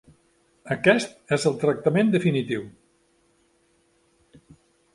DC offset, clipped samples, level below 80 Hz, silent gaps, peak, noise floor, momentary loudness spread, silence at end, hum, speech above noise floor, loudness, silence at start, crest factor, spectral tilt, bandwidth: under 0.1%; under 0.1%; -64 dBFS; none; -4 dBFS; -65 dBFS; 11 LU; 2.25 s; none; 43 dB; -23 LUFS; 0.65 s; 22 dB; -6 dB/octave; 11.5 kHz